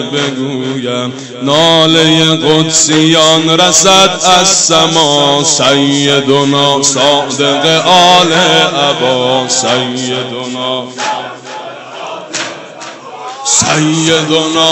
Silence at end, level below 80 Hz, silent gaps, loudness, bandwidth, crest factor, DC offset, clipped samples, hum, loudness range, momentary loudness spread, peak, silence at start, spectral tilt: 0 s; -50 dBFS; none; -8 LUFS; 16.5 kHz; 10 dB; under 0.1%; 0.2%; none; 9 LU; 16 LU; 0 dBFS; 0 s; -2.5 dB/octave